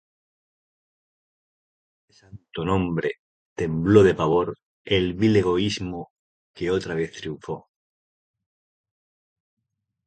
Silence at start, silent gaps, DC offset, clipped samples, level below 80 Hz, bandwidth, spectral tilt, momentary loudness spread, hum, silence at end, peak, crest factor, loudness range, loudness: 2.35 s; 3.19-3.56 s, 4.63-4.85 s, 6.10-6.54 s; under 0.1%; under 0.1%; -48 dBFS; 9.2 kHz; -6.5 dB/octave; 19 LU; none; 2.45 s; -2 dBFS; 24 dB; 11 LU; -23 LUFS